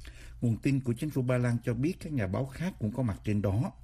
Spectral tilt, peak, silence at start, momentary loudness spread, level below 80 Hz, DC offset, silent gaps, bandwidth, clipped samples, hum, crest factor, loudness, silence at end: -8 dB/octave; -16 dBFS; 0 s; 5 LU; -50 dBFS; under 0.1%; none; 14.5 kHz; under 0.1%; none; 14 dB; -31 LUFS; 0.05 s